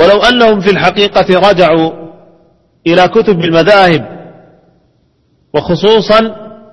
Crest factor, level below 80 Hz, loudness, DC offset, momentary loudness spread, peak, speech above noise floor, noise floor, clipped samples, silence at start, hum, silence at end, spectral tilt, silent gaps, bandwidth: 10 dB; -40 dBFS; -8 LUFS; under 0.1%; 12 LU; 0 dBFS; 46 dB; -54 dBFS; 0.9%; 0 s; none; 0.25 s; -6 dB/octave; none; 11 kHz